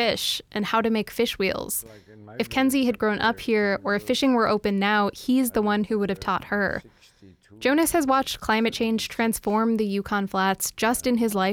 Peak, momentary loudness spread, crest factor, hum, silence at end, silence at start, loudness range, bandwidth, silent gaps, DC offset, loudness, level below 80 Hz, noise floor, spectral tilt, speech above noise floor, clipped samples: -10 dBFS; 5 LU; 14 dB; none; 0 s; 0 s; 2 LU; 19.5 kHz; none; under 0.1%; -24 LUFS; -52 dBFS; -53 dBFS; -4 dB/octave; 29 dB; under 0.1%